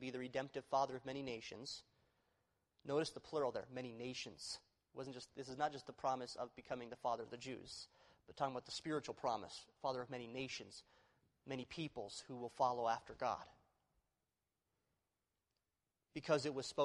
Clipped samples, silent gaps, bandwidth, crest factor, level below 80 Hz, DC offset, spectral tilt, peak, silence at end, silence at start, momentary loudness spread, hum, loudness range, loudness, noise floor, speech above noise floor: under 0.1%; none; 11.5 kHz; 22 dB; -78 dBFS; under 0.1%; -4.5 dB/octave; -24 dBFS; 0 s; 0 s; 13 LU; none; 3 LU; -45 LUFS; under -90 dBFS; over 45 dB